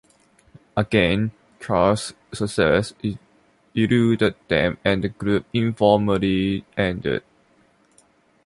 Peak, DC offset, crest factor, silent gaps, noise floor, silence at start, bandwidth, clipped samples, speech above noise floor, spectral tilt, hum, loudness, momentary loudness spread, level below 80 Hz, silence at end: -2 dBFS; under 0.1%; 20 dB; none; -59 dBFS; 0.75 s; 11.5 kHz; under 0.1%; 39 dB; -6.5 dB/octave; none; -21 LUFS; 11 LU; -46 dBFS; 1.25 s